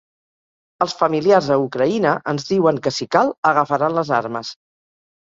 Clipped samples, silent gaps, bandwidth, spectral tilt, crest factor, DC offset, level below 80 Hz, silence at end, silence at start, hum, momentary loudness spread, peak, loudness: under 0.1%; 3.38-3.43 s; 7.8 kHz; -5.5 dB/octave; 18 dB; under 0.1%; -62 dBFS; 0.7 s; 0.8 s; none; 8 LU; -2 dBFS; -18 LUFS